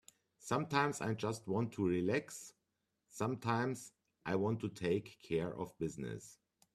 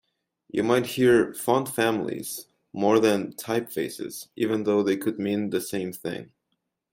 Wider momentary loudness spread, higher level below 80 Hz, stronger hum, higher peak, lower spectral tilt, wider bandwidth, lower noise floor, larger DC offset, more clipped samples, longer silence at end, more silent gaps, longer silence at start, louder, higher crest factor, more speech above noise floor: about the same, 15 LU vs 14 LU; second, -72 dBFS vs -64 dBFS; neither; second, -18 dBFS vs -8 dBFS; about the same, -6 dB/octave vs -5 dB/octave; second, 14.5 kHz vs 16.5 kHz; first, -86 dBFS vs -78 dBFS; neither; neither; second, 0.4 s vs 0.7 s; neither; second, 0.4 s vs 0.55 s; second, -38 LUFS vs -25 LUFS; about the same, 22 dB vs 18 dB; second, 48 dB vs 54 dB